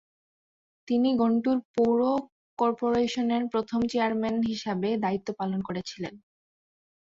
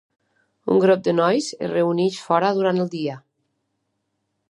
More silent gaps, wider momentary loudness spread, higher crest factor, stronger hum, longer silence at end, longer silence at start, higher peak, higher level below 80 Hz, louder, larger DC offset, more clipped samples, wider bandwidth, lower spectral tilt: first, 1.65-1.74 s, 2.32-2.57 s vs none; about the same, 9 LU vs 11 LU; about the same, 14 dB vs 18 dB; neither; second, 0.95 s vs 1.3 s; first, 0.85 s vs 0.65 s; second, -14 dBFS vs -4 dBFS; first, -64 dBFS vs -70 dBFS; second, -27 LUFS vs -20 LUFS; neither; neither; second, 7.6 kHz vs 11.5 kHz; about the same, -6.5 dB/octave vs -6 dB/octave